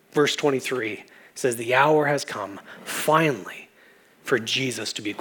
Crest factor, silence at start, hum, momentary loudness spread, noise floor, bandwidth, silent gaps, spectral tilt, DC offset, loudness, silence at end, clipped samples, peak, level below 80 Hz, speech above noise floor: 20 dB; 0.15 s; none; 19 LU; -55 dBFS; over 20 kHz; none; -4 dB/octave; under 0.1%; -23 LUFS; 0 s; under 0.1%; -4 dBFS; -80 dBFS; 31 dB